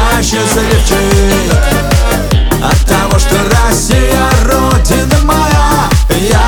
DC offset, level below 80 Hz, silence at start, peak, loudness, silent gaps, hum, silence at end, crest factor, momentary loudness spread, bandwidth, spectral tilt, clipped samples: under 0.1%; -12 dBFS; 0 s; 0 dBFS; -9 LUFS; none; none; 0 s; 8 dB; 2 LU; over 20 kHz; -4.5 dB/octave; under 0.1%